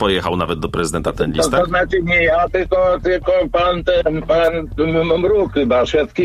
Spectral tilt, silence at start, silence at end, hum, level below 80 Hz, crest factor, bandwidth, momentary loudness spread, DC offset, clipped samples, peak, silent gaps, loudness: -5 dB/octave; 0 s; 0 s; none; -32 dBFS; 16 dB; 14 kHz; 5 LU; under 0.1%; under 0.1%; 0 dBFS; none; -16 LUFS